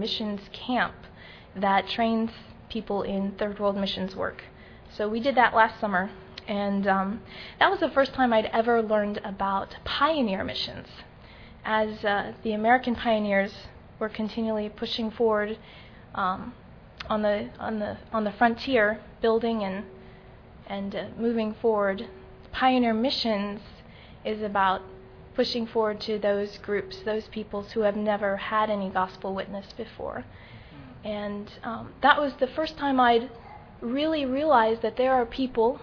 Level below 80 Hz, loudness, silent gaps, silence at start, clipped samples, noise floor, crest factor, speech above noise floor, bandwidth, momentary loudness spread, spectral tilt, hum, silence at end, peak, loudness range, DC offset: -54 dBFS; -27 LUFS; none; 0 s; under 0.1%; -48 dBFS; 22 dB; 22 dB; 5.4 kHz; 17 LU; -6.5 dB/octave; none; 0 s; -4 dBFS; 5 LU; under 0.1%